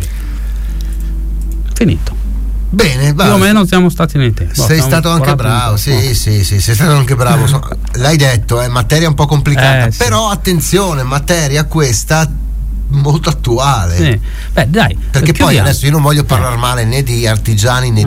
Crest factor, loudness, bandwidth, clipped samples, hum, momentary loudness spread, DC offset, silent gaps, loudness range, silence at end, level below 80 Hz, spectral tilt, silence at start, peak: 10 dB; -11 LUFS; 16.5 kHz; under 0.1%; none; 11 LU; under 0.1%; none; 2 LU; 0 s; -20 dBFS; -5 dB/octave; 0 s; 0 dBFS